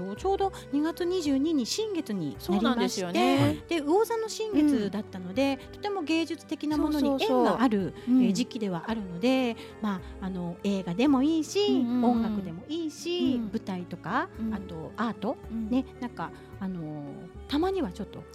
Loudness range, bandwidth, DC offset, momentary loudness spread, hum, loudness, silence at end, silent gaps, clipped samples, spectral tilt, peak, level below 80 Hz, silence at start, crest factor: 6 LU; 14.5 kHz; under 0.1%; 12 LU; none; -28 LUFS; 0 s; none; under 0.1%; -5.5 dB/octave; -12 dBFS; -52 dBFS; 0 s; 16 dB